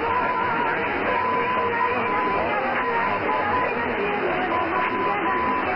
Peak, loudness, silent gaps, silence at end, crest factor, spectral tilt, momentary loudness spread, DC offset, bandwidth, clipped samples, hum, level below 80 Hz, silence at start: -10 dBFS; -23 LUFS; none; 0 s; 12 dB; -7.5 dB/octave; 1 LU; 0.3%; 5.8 kHz; under 0.1%; none; -54 dBFS; 0 s